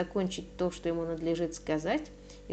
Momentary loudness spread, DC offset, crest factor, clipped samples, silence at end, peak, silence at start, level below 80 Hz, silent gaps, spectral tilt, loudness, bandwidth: 4 LU; under 0.1%; 16 dB; under 0.1%; 0 s; -18 dBFS; 0 s; -52 dBFS; none; -5.5 dB/octave; -33 LUFS; 9 kHz